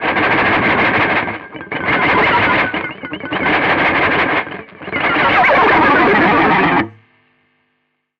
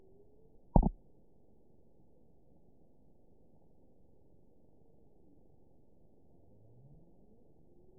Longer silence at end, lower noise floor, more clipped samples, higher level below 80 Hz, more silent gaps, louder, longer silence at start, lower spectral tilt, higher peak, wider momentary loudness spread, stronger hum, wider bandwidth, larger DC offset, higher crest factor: second, 1.3 s vs 7.05 s; about the same, -67 dBFS vs -67 dBFS; neither; about the same, -42 dBFS vs -44 dBFS; neither; first, -13 LUFS vs -33 LUFS; second, 0 s vs 0.75 s; about the same, -6.5 dB/octave vs -5.5 dB/octave; first, -4 dBFS vs -8 dBFS; second, 13 LU vs 31 LU; neither; first, 7.2 kHz vs 1 kHz; neither; second, 10 dB vs 32 dB